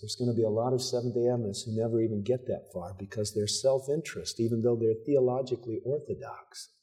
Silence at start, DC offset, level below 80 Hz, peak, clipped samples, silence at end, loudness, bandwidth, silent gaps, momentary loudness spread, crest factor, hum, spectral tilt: 0 s; under 0.1%; -70 dBFS; -14 dBFS; under 0.1%; 0.15 s; -30 LUFS; 15 kHz; none; 12 LU; 16 dB; none; -5.5 dB/octave